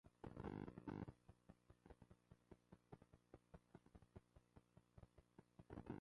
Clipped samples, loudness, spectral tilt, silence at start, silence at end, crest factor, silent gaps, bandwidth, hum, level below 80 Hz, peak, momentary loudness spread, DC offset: under 0.1%; -59 LUFS; -8.5 dB/octave; 0.05 s; 0 s; 22 dB; none; 10.5 kHz; none; -72 dBFS; -40 dBFS; 15 LU; under 0.1%